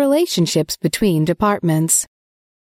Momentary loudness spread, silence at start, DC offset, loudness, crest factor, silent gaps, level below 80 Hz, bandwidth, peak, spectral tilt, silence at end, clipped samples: 4 LU; 0 s; under 0.1%; -17 LUFS; 16 dB; none; -46 dBFS; 16.5 kHz; -2 dBFS; -4.5 dB/octave; 0.75 s; under 0.1%